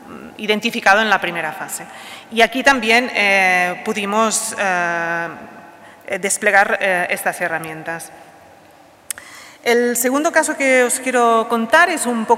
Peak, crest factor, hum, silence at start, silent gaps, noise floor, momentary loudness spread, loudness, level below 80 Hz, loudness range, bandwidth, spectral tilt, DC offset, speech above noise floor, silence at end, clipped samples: -2 dBFS; 16 dB; none; 0 s; none; -47 dBFS; 15 LU; -16 LUFS; -58 dBFS; 5 LU; 16 kHz; -2 dB/octave; under 0.1%; 29 dB; 0 s; under 0.1%